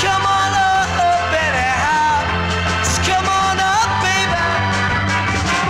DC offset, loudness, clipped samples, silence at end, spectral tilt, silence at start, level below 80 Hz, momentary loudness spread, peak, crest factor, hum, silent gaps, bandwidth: under 0.1%; -16 LUFS; under 0.1%; 0 s; -3.5 dB/octave; 0 s; -34 dBFS; 2 LU; -8 dBFS; 8 dB; none; none; 15.5 kHz